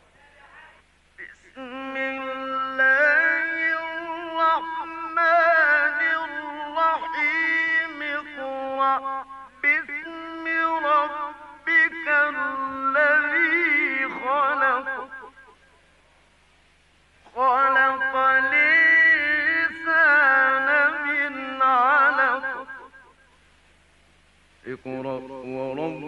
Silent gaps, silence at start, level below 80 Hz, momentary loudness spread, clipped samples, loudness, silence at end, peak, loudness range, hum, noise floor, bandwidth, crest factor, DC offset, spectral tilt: none; 0.55 s; -64 dBFS; 16 LU; under 0.1%; -20 LUFS; 0 s; -8 dBFS; 8 LU; none; -59 dBFS; 9.6 kHz; 14 dB; under 0.1%; -4.5 dB/octave